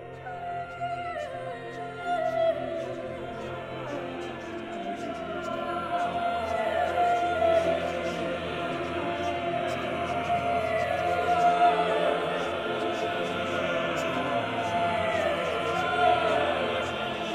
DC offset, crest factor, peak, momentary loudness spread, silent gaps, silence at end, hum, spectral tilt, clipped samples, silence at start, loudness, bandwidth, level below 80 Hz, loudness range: under 0.1%; 18 dB; -10 dBFS; 12 LU; none; 0 s; none; -5 dB/octave; under 0.1%; 0 s; -28 LUFS; 13.5 kHz; -58 dBFS; 6 LU